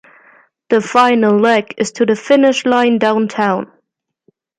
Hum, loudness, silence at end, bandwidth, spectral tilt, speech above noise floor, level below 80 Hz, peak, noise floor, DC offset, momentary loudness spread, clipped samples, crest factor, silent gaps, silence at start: none; -13 LUFS; 0.95 s; 10.5 kHz; -5 dB/octave; 55 dB; -62 dBFS; 0 dBFS; -68 dBFS; under 0.1%; 6 LU; under 0.1%; 14 dB; none; 0.7 s